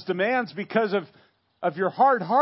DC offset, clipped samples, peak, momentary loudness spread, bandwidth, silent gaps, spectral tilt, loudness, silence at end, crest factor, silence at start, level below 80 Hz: under 0.1%; under 0.1%; -8 dBFS; 9 LU; 5.8 kHz; none; -10 dB/octave; -24 LUFS; 0 s; 16 dB; 0 s; -80 dBFS